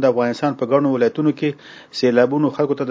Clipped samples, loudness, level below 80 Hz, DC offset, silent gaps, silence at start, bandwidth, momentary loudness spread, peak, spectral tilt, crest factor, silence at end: under 0.1%; -18 LUFS; -66 dBFS; under 0.1%; none; 0 s; 7.8 kHz; 8 LU; -2 dBFS; -7 dB/octave; 16 dB; 0 s